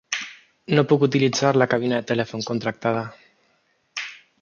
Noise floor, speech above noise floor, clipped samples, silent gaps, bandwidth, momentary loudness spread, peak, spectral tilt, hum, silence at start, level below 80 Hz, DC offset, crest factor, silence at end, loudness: -66 dBFS; 45 dB; under 0.1%; none; 7.2 kHz; 16 LU; -2 dBFS; -5.5 dB/octave; none; 0.1 s; -64 dBFS; under 0.1%; 20 dB; 0.25 s; -22 LUFS